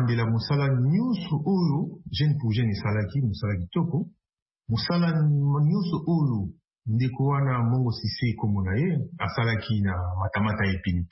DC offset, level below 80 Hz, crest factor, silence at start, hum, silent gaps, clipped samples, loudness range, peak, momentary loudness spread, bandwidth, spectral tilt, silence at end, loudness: under 0.1%; -50 dBFS; 12 dB; 0 s; none; 4.42-4.46 s; under 0.1%; 2 LU; -14 dBFS; 6 LU; 5.8 kHz; -11 dB/octave; 0.05 s; -26 LUFS